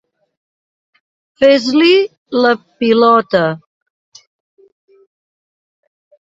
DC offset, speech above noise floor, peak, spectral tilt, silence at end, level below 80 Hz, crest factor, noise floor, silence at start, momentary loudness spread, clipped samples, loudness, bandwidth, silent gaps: under 0.1%; over 79 dB; 0 dBFS; -5.5 dB/octave; 2.8 s; -60 dBFS; 16 dB; under -90 dBFS; 1.4 s; 8 LU; under 0.1%; -12 LUFS; 7.8 kHz; 2.17-2.26 s